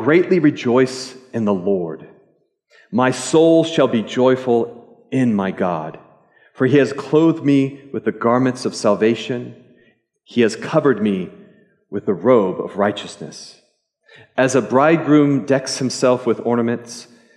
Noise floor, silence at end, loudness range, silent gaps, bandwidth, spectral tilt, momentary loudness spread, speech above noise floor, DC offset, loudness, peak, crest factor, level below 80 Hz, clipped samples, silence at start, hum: -60 dBFS; 0.35 s; 3 LU; none; 11.5 kHz; -6 dB/octave; 14 LU; 43 dB; under 0.1%; -17 LUFS; -2 dBFS; 16 dB; -70 dBFS; under 0.1%; 0 s; none